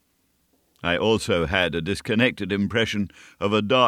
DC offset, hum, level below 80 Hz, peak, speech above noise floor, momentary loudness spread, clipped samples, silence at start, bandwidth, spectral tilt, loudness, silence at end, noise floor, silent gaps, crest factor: under 0.1%; none; -48 dBFS; -4 dBFS; 45 dB; 8 LU; under 0.1%; 0.85 s; 14.5 kHz; -5 dB/octave; -23 LUFS; 0 s; -68 dBFS; none; 20 dB